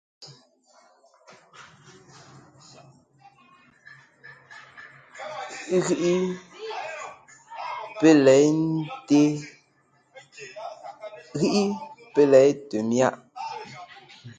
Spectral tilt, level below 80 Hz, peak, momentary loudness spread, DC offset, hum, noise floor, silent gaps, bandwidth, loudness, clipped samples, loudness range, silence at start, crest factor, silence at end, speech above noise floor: -5.5 dB/octave; -70 dBFS; -4 dBFS; 27 LU; under 0.1%; none; -64 dBFS; none; 9.4 kHz; -22 LUFS; under 0.1%; 8 LU; 0.2 s; 20 dB; 0.05 s; 44 dB